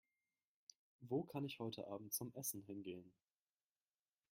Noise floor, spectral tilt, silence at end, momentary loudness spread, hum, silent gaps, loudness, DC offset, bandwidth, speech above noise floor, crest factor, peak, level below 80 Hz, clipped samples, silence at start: under -90 dBFS; -4.5 dB/octave; 1.2 s; 22 LU; none; none; -48 LUFS; under 0.1%; 16 kHz; over 42 dB; 20 dB; -30 dBFS; -88 dBFS; under 0.1%; 1 s